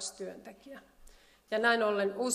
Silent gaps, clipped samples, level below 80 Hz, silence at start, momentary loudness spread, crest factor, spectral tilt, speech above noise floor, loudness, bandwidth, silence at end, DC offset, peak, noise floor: none; under 0.1%; -66 dBFS; 0 s; 24 LU; 20 dB; -2.5 dB/octave; 26 dB; -30 LUFS; 15 kHz; 0 s; under 0.1%; -14 dBFS; -58 dBFS